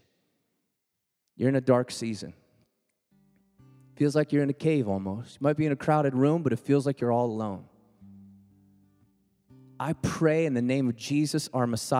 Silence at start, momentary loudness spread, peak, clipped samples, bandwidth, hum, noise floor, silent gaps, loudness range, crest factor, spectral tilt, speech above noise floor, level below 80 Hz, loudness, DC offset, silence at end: 1.4 s; 9 LU; -8 dBFS; under 0.1%; 15.5 kHz; none; -82 dBFS; none; 6 LU; 20 dB; -6.5 dB/octave; 56 dB; -64 dBFS; -27 LUFS; under 0.1%; 0 s